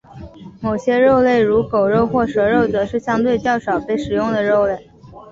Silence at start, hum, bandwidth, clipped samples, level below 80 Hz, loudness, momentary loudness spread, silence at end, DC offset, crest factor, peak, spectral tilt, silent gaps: 0.1 s; none; 7.8 kHz; under 0.1%; -44 dBFS; -17 LUFS; 7 LU; 0 s; under 0.1%; 14 dB; -4 dBFS; -7 dB/octave; none